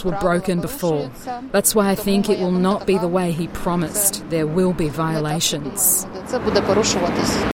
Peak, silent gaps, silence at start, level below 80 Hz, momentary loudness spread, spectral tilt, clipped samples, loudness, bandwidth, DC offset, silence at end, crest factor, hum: -2 dBFS; none; 0 s; -40 dBFS; 7 LU; -4 dB/octave; under 0.1%; -19 LUFS; 17 kHz; under 0.1%; 0.05 s; 18 dB; none